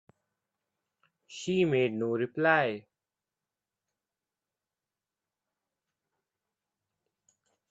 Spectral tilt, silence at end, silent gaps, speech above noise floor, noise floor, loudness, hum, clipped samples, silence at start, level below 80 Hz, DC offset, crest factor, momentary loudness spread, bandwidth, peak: -6 dB/octave; 4.9 s; none; over 62 dB; under -90 dBFS; -28 LUFS; none; under 0.1%; 1.3 s; -78 dBFS; under 0.1%; 26 dB; 15 LU; 8 kHz; -10 dBFS